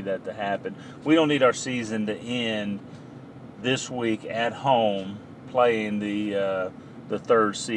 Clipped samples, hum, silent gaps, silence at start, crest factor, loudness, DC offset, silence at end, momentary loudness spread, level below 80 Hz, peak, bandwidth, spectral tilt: under 0.1%; none; none; 0 s; 18 dB; -25 LUFS; under 0.1%; 0 s; 16 LU; -66 dBFS; -6 dBFS; 10.5 kHz; -4.5 dB/octave